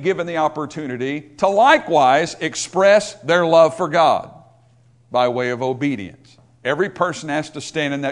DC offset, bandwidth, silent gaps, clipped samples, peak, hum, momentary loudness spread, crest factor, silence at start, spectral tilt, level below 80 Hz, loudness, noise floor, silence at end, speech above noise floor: under 0.1%; 11 kHz; none; under 0.1%; 0 dBFS; none; 12 LU; 18 dB; 0 s; -4.5 dB/octave; -60 dBFS; -18 LUFS; -53 dBFS; 0 s; 35 dB